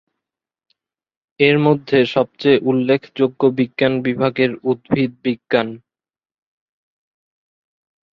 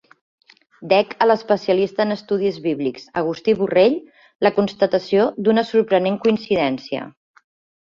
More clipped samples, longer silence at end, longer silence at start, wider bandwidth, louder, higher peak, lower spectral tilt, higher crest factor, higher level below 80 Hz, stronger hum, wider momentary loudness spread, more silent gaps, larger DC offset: neither; first, 2.35 s vs 0.75 s; first, 1.4 s vs 0.8 s; second, 6.2 kHz vs 7.2 kHz; about the same, -17 LUFS vs -19 LUFS; about the same, -2 dBFS vs -2 dBFS; about the same, -8 dB/octave vs -7 dB/octave; about the same, 18 dB vs 18 dB; about the same, -58 dBFS vs -62 dBFS; neither; second, 5 LU vs 8 LU; second, none vs 4.35-4.39 s; neither